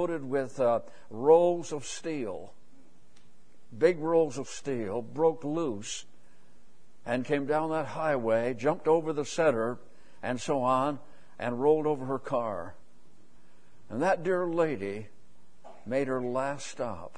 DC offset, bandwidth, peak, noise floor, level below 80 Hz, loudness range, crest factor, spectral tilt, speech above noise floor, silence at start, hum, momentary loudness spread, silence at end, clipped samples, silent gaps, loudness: 0.8%; 10 kHz; -10 dBFS; -62 dBFS; -66 dBFS; 4 LU; 20 dB; -5.5 dB/octave; 34 dB; 0 s; none; 12 LU; 0.1 s; under 0.1%; none; -29 LUFS